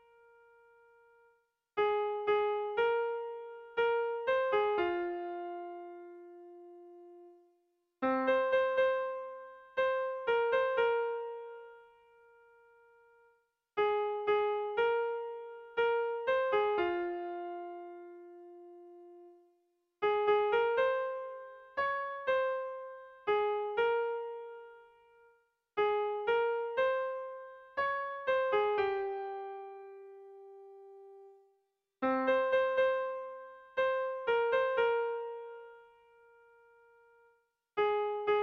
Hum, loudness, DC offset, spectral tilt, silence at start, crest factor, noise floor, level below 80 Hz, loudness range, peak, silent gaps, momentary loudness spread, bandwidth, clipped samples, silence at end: none; -33 LUFS; under 0.1%; -5.5 dB/octave; 1.75 s; 16 dB; -79 dBFS; -74 dBFS; 7 LU; -18 dBFS; none; 22 LU; 6.2 kHz; under 0.1%; 0 s